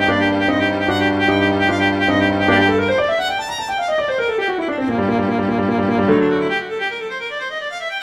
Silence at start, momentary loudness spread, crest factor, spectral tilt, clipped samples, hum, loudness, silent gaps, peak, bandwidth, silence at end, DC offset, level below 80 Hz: 0 s; 8 LU; 16 dB; -5.5 dB/octave; under 0.1%; none; -18 LUFS; none; -2 dBFS; 13 kHz; 0 s; under 0.1%; -48 dBFS